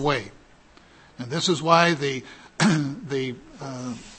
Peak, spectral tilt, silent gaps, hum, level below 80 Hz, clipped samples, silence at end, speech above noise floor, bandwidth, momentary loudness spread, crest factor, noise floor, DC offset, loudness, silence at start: -2 dBFS; -4.5 dB/octave; none; none; -54 dBFS; under 0.1%; 0 s; 29 dB; 8.8 kHz; 19 LU; 22 dB; -53 dBFS; under 0.1%; -23 LUFS; 0 s